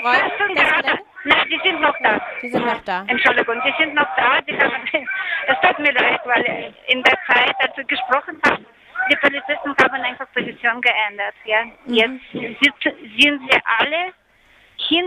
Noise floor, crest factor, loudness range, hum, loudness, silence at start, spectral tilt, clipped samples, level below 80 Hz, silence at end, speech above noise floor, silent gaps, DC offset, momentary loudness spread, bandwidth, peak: -53 dBFS; 18 dB; 2 LU; none; -17 LUFS; 0 s; -3.5 dB/octave; under 0.1%; -58 dBFS; 0 s; 34 dB; none; under 0.1%; 9 LU; 15 kHz; -2 dBFS